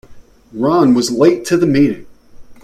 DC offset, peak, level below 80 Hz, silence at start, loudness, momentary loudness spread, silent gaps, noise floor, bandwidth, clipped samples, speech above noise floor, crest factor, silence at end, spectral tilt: under 0.1%; 0 dBFS; -46 dBFS; 0.1 s; -13 LUFS; 11 LU; none; -36 dBFS; 14 kHz; under 0.1%; 23 dB; 14 dB; 0.1 s; -6 dB/octave